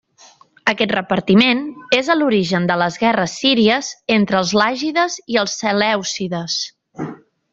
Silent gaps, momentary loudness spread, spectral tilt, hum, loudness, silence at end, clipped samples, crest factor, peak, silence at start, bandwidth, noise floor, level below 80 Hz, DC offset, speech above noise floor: none; 9 LU; -4 dB/octave; none; -17 LUFS; 0.35 s; under 0.1%; 16 dB; -2 dBFS; 0.65 s; 7.8 kHz; -48 dBFS; -58 dBFS; under 0.1%; 32 dB